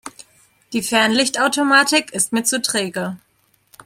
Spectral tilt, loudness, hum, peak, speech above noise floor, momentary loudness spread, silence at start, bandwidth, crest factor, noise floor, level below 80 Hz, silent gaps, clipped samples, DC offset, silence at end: -2 dB/octave; -17 LUFS; none; -2 dBFS; 43 dB; 14 LU; 0.05 s; 16.5 kHz; 18 dB; -61 dBFS; -64 dBFS; none; under 0.1%; under 0.1%; 0.7 s